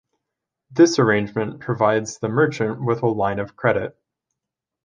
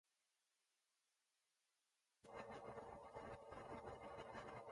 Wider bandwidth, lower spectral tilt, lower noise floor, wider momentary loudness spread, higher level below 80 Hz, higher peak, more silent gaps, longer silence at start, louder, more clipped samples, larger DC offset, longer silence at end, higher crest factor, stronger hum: second, 9.4 kHz vs 11 kHz; about the same, -6 dB/octave vs -5.5 dB/octave; second, -85 dBFS vs -90 dBFS; first, 10 LU vs 2 LU; first, -56 dBFS vs -76 dBFS; first, -2 dBFS vs -40 dBFS; neither; second, 0.7 s vs 2.25 s; first, -20 LUFS vs -57 LUFS; neither; neither; first, 0.95 s vs 0 s; about the same, 20 dB vs 18 dB; neither